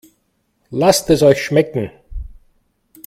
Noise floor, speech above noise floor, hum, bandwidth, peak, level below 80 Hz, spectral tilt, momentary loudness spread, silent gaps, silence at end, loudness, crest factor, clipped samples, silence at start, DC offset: -65 dBFS; 51 dB; none; 16 kHz; 0 dBFS; -38 dBFS; -5 dB/octave; 23 LU; none; 0.8 s; -15 LUFS; 18 dB; under 0.1%; 0.7 s; under 0.1%